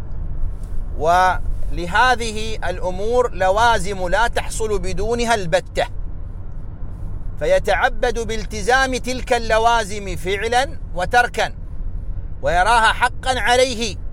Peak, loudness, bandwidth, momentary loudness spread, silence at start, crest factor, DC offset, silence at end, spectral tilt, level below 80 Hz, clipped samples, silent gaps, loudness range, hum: -2 dBFS; -19 LUFS; 15.5 kHz; 17 LU; 0 s; 16 dB; under 0.1%; 0 s; -3.5 dB/octave; -26 dBFS; under 0.1%; none; 4 LU; none